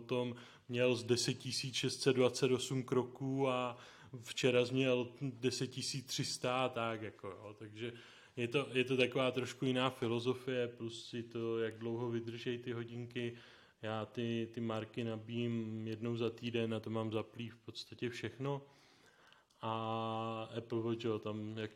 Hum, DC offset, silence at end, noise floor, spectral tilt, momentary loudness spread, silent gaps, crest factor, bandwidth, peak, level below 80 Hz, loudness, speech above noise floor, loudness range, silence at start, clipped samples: none; under 0.1%; 0 s; -67 dBFS; -5 dB/octave; 13 LU; none; 22 dB; 16 kHz; -16 dBFS; -80 dBFS; -38 LUFS; 29 dB; 7 LU; 0 s; under 0.1%